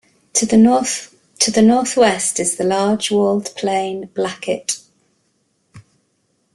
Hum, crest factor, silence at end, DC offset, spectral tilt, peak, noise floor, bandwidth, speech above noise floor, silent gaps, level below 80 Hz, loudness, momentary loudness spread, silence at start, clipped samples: none; 18 dB; 0.75 s; under 0.1%; -3.5 dB/octave; 0 dBFS; -65 dBFS; 12.5 kHz; 49 dB; none; -56 dBFS; -16 LUFS; 11 LU; 0.35 s; under 0.1%